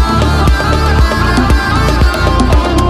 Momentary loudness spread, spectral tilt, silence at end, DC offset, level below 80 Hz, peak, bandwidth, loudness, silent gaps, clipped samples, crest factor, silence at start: 1 LU; -6 dB/octave; 0 s; under 0.1%; -12 dBFS; 0 dBFS; 15.5 kHz; -11 LUFS; none; under 0.1%; 10 dB; 0 s